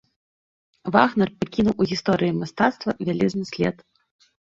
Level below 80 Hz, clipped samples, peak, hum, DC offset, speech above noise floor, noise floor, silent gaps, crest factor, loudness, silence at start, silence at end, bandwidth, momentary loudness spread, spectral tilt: -54 dBFS; under 0.1%; -2 dBFS; none; under 0.1%; over 68 dB; under -90 dBFS; none; 22 dB; -22 LUFS; 0.85 s; 0.7 s; 7.6 kHz; 7 LU; -6.5 dB/octave